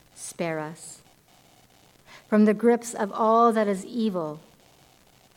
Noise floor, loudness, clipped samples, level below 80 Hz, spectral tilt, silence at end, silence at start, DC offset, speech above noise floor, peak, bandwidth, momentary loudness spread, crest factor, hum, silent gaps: -58 dBFS; -24 LUFS; under 0.1%; -70 dBFS; -6 dB/octave; 1 s; 0.2 s; under 0.1%; 34 dB; -8 dBFS; 15.5 kHz; 19 LU; 18 dB; none; none